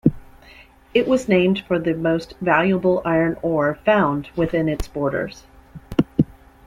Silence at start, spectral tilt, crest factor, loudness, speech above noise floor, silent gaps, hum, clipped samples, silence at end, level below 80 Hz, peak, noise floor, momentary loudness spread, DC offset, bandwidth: 0.05 s; -7 dB/octave; 18 dB; -20 LUFS; 28 dB; none; none; under 0.1%; 0.35 s; -42 dBFS; -2 dBFS; -47 dBFS; 6 LU; under 0.1%; 15 kHz